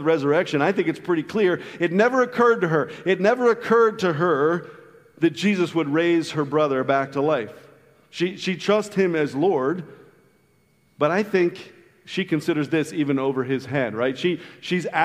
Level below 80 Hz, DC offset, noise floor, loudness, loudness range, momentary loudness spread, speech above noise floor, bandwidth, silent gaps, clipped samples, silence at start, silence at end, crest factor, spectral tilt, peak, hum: -70 dBFS; under 0.1%; -61 dBFS; -22 LUFS; 5 LU; 7 LU; 40 dB; 13.5 kHz; none; under 0.1%; 0 s; 0 s; 18 dB; -6 dB/octave; -4 dBFS; none